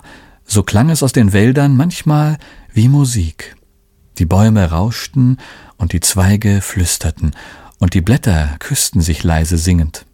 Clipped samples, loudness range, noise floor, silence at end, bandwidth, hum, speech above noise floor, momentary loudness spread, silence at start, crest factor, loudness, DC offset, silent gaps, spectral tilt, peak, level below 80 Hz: under 0.1%; 2 LU; -52 dBFS; 0.15 s; 17 kHz; none; 39 dB; 10 LU; 0.5 s; 14 dB; -14 LUFS; under 0.1%; none; -5.5 dB/octave; 0 dBFS; -26 dBFS